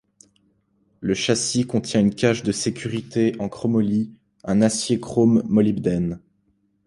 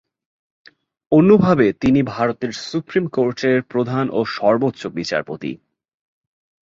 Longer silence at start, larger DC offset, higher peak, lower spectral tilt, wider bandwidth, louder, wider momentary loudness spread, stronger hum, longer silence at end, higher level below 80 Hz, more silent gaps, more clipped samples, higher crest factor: about the same, 1 s vs 1.1 s; neither; about the same, -4 dBFS vs -2 dBFS; second, -5.5 dB/octave vs -7 dB/octave; first, 11.5 kHz vs 7.8 kHz; second, -21 LUFS vs -18 LUFS; second, 10 LU vs 13 LU; neither; second, 0.7 s vs 1.1 s; about the same, -52 dBFS vs -52 dBFS; neither; neither; about the same, 18 dB vs 18 dB